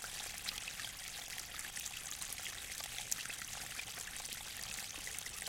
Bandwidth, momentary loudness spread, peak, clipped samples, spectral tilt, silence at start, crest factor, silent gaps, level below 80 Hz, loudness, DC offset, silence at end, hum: 17 kHz; 4 LU; -16 dBFS; under 0.1%; 0.5 dB/octave; 0 s; 30 dB; none; -62 dBFS; -42 LUFS; under 0.1%; 0 s; none